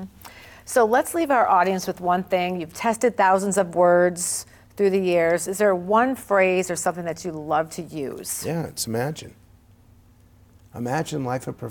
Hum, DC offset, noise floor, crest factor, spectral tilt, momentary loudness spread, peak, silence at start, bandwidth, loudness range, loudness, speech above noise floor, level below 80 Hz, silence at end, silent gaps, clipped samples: none; under 0.1%; -53 dBFS; 16 dB; -4.5 dB/octave; 12 LU; -8 dBFS; 0 s; 17.5 kHz; 9 LU; -22 LUFS; 31 dB; -58 dBFS; 0 s; none; under 0.1%